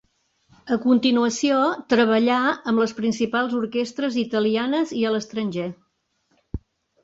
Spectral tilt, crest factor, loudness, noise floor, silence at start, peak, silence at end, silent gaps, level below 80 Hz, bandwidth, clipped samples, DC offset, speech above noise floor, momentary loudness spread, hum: -4.5 dB/octave; 14 dB; -22 LUFS; -70 dBFS; 0.65 s; -8 dBFS; 0.45 s; none; -50 dBFS; 7.8 kHz; under 0.1%; under 0.1%; 49 dB; 10 LU; none